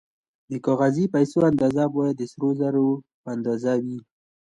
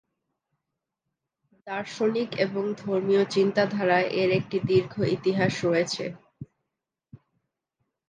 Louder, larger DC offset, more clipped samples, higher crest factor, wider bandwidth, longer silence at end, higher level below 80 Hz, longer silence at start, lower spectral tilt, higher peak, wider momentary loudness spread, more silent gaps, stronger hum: about the same, -23 LUFS vs -25 LUFS; neither; neither; about the same, 16 dB vs 18 dB; about the same, 9.6 kHz vs 9.4 kHz; second, 0.6 s vs 0.95 s; about the same, -62 dBFS vs -66 dBFS; second, 0.5 s vs 1.65 s; first, -8 dB/octave vs -6 dB/octave; first, -6 dBFS vs -10 dBFS; about the same, 12 LU vs 10 LU; first, 3.14-3.24 s vs none; neither